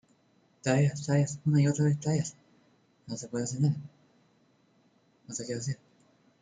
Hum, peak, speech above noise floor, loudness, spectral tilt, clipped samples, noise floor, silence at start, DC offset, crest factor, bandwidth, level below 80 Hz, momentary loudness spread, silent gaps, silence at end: none; -12 dBFS; 39 dB; -30 LUFS; -6.5 dB/octave; under 0.1%; -67 dBFS; 0.65 s; under 0.1%; 20 dB; 9.4 kHz; -68 dBFS; 14 LU; none; 0.65 s